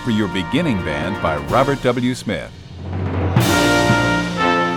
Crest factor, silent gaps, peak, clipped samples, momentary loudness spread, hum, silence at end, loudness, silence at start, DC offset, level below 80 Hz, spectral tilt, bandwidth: 16 dB; none; -2 dBFS; under 0.1%; 11 LU; none; 0 s; -18 LUFS; 0 s; under 0.1%; -38 dBFS; -5.5 dB/octave; 19.5 kHz